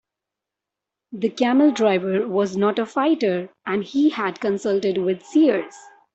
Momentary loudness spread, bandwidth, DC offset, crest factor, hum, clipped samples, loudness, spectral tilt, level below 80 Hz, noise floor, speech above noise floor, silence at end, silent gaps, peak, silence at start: 9 LU; 8.2 kHz; under 0.1%; 16 dB; none; under 0.1%; -21 LUFS; -6 dB/octave; -68 dBFS; -86 dBFS; 65 dB; 0.35 s; none; -6 dBFS; 1.1 s